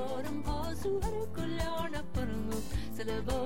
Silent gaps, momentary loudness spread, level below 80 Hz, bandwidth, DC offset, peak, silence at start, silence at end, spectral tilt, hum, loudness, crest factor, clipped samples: none; 3 LU; -42 dBFS; 17 kHz; 1%; -22 dBFS; 0 s; 0 s; -6 dB/octave; none; -37 LUFS; 14 dB; under 0.1%